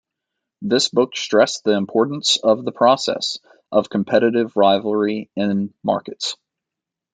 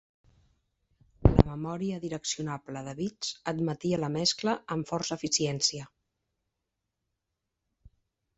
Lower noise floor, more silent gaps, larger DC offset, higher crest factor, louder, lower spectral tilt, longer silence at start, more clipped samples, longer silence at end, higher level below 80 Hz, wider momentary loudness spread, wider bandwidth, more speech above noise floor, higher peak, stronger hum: about the same, -85 dBFS vs -85 dBFS; neither; neither; second, 18 dB vs 32 dB; first, -19 LUFS vs -30 LUFS; about the same, -4 dB/octave vs -4.5 dB/octave; second, 0.6 s vs 1.2 s; neither; first, 0.8 s vs 0.5 s; second, -66 dBFS vs -42 dBFS; about the same, 9 LU vs 11 LU; first, 9.4 kHz vs 8.2 kHz; first, 67 dB vs 53 dB; about the same, -2 dBFS vs 0 dBFS; neither